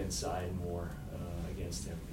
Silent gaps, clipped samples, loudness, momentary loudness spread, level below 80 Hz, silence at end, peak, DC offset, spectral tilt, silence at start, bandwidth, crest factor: none; under 0.1%; -40 LUFS; 6 LU; -48 dBFS; 0 s; -26 dBFS; under 0.1%; -5 dB/octave; 0 s; 16 kHz; 14 dB